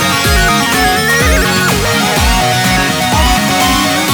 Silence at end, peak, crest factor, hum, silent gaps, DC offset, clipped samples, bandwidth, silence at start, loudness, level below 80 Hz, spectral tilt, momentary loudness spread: 0 s; 0 dBFS; 10 dB; none; none; under 0.1%; under 0.1%; over 20 kHz; 0 s; -10 LUFS; -20 dBFS; -3 dB/octave; 1 LU